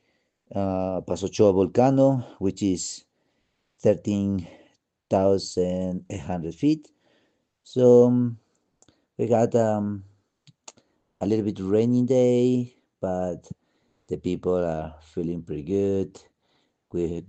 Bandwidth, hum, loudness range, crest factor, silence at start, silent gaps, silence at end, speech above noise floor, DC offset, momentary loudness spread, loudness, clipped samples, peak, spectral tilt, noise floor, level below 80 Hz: 8.8 kHz; none; 6 LU; 20 dB; 0.55 s; none; 0.05 s; 50 dB; under 0.1%; 14 LU; -24 LUFS; under 0.1%; -6 dBFS; -7 dB/octave; -73 dBFS; -60 dBFS